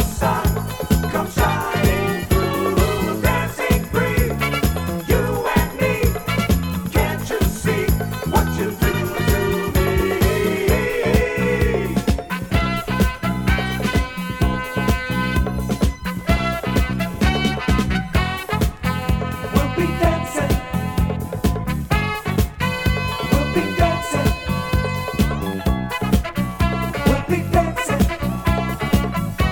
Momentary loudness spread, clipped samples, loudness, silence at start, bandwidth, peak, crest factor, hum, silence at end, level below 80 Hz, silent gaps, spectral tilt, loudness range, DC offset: 4 LU; under 0.1%; -20 LUFS; 0 s; 19.5 kHz; -2 dBFS; 18 dB; none; 0 s; -26 dBFS; none; -5.5 dB/octave; 2 LU; under 0.1%